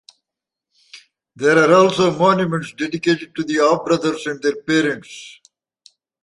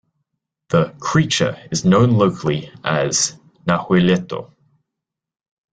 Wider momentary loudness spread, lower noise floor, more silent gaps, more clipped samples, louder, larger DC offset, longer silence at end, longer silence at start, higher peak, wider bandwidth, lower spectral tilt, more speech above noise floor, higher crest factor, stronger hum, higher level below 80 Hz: about the same, 11 LU vs 9 LU; about the same, -85 dBFS vs -83 dBFS; neither; neither; about the same, -17 LUFS vs -18 LUFS; neither; second, 0.9 s vs 1.3 s; first, 0.95 s vs 0.7 s; about the same, -2 dBFS vs -2 dBFS; first, 11.5 kHz vs 9.4 kHz; about the same, -5 dB/octave vs -5 dB/octave; about the same, 68 dB vs 66 dB; about the same, 16 dB vs 18 dB; neither; second, -60 dBFS vs -50 dBFS